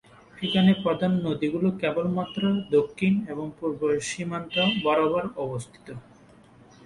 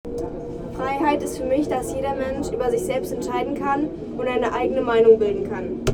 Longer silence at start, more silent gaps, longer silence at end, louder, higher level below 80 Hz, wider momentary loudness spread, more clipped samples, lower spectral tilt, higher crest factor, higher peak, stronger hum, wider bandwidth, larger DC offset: first, 0.35 s vs 0.05 s; neither; first, 0.85 s vs 0 s; second, -25 LUFS vs -22 LUFS; second, -60 dBFS vs -42 dBFS; about the same, 12 LU vs 11 LU; neither; about the same, -6 dB/octave vs -6 dB/octave; about the same, 16 dB vs 18 dB; second, -8 dBFS vs -4 dBFS; neither; second, 11.5 kHz vs 16 kHz; neither